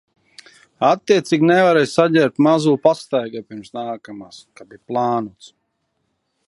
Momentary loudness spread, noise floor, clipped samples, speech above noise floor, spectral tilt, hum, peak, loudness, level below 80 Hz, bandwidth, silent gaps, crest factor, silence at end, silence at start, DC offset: 18 LU; -71 dBFS; under 0.1%; 53 dB; -6 dB/octave; none; 0 dBFS; -17 LUFS; -66 dBFS; 11.5 kHz; none; 18 dB; 1.2 s; 0.8 s; under 0.1%